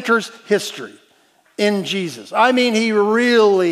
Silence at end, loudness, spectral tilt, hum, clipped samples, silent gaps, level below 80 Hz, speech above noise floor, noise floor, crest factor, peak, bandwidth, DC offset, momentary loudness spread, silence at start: 0 s; -17 LUFS; -4 dB/octave; none; under 0.1%; none; -78 dBFS; 40 dB; -56 dBFS; 16 dB; 0 dBFS; 15 kHz; under 0.1%; 15 LU; 0 s